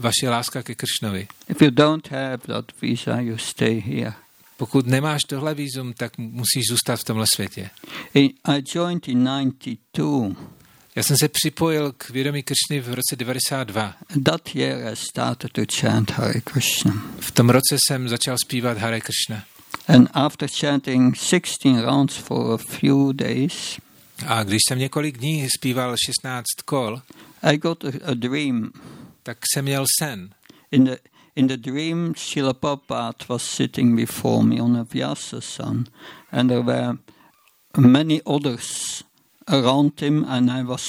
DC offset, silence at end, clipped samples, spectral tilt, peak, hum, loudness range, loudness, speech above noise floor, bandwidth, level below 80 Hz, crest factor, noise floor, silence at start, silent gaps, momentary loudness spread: under 0.1%; 0 s; under 0.1%; -4.5 dB/octave; 0 dBFS; none; 4 LU; -21 LUFS; 36 dB; 17 kHz; -60 dBFS; 20 dB; -57 dBFS; 0 s; none; 11 LU